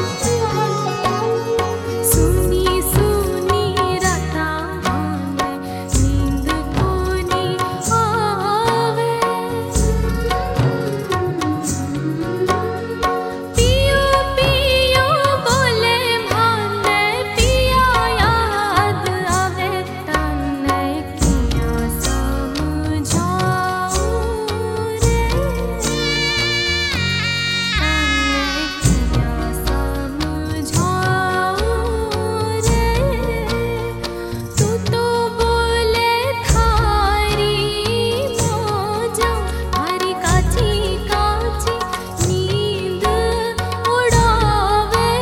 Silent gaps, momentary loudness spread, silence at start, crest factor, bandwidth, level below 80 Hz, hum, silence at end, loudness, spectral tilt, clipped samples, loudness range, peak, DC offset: none; 7 LU; 0 s; 16 dB; 17.5 kHz; -26 dBFS; none; 0 s; -18 LUFS; -4.5 dB/octave; under 0.1%; 4 LU; 0 dBFS; under 0.1%